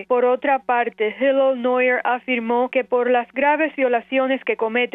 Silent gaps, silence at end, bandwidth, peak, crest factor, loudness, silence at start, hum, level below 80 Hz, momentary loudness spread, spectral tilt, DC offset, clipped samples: none; 0.05 s; 3.9 kHz; -6 dBFS; 12 dB; -19 LUFS; 0 s; none; -68 dBFS; 3 LU; -7 dB/octave; under 0.1%; under 0.1%